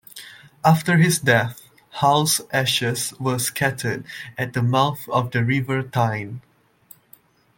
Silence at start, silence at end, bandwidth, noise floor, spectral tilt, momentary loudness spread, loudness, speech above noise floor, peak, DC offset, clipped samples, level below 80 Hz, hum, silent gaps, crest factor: 0.15 s; 1.15 s; 17 kHz; -54 dBFS; -4.5 dB/octave; 14 LU; -21 LUFS; 33 dB; -2 dBFS; under 0.1%; under 0.1%; -58 dBFS; none; none; 20 dB